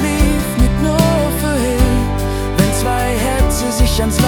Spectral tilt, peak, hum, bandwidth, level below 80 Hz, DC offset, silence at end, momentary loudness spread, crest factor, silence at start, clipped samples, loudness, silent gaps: -5 dB/octave; 0 dBFS; none; 18 kHz; -18 dBFS; under 0.1%; 0 s; 3 LU; 14 dB; 0 s; under 0.1%; -15 LUFS; none